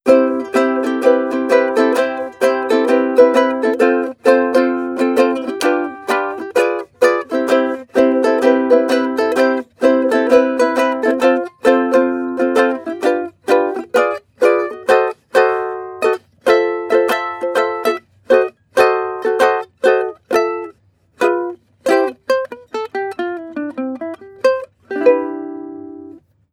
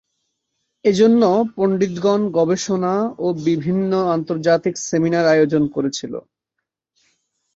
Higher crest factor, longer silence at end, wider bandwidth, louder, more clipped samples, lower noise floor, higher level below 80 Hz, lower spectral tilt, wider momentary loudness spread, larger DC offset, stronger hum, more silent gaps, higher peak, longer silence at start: about the same, 16 dB vs 16 dB; second, 0.35 s vs 1.35 s; first, 16 kHz vs 8 kHz; about the same, -16 LUFS vs -18 LUFS; neither; second, -51 dBFS vs -80 dBFS; about the same, -64 dBFS vs -60 dBFS; second, -4 dB/octave vs -6 dB/octave; first, 11 LU vs 7 LU; neither; neither; neither; first, 0 dBFS vs -4 dBFS; second, 0.05 s vs 0.85 s